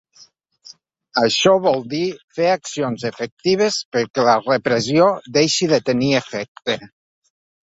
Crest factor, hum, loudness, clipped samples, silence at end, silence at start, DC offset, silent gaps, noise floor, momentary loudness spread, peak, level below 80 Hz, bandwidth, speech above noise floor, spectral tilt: 18 dB; none; -18 LUFS; under 0.1%; 0.8 s; 0.65 s; under 0.1%; 2.24-2.28 s, 3.32-3.37 s, 3.85-3.92 s, 4.10-4.14 s, 6.48-6.55 s; -51 dBFS; 10 LU; 0 dBFS; -60 dBFS; 8 kHz; 33 dB; -4 dB/octave